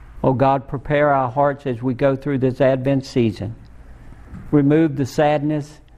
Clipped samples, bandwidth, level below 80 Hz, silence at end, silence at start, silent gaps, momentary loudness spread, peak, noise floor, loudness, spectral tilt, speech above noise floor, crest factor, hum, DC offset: under 0.1%; 14.5 kHz; -44 dBFS; 0.25 s; 0 s; none; 7 LU; -4 dBFS; -39 dBFS; -19 LUFS; -8 dB/octave; 21 dB; 16 dB; none; under 0.1%